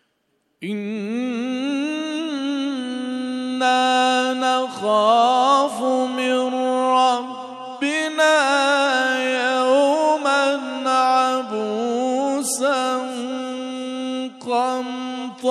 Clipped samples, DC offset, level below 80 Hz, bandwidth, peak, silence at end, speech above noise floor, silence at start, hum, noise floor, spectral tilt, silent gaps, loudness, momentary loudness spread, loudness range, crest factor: under 0.1%; under 0.1%; -76 dBFS; 14 kHz; -4 dBFS; 0 s; 50 dB; 0.6 s; none; -69 dBFS; -2.5 dB/octave; none; -20 LUFS; 11 LU; 5 LU; 16 dB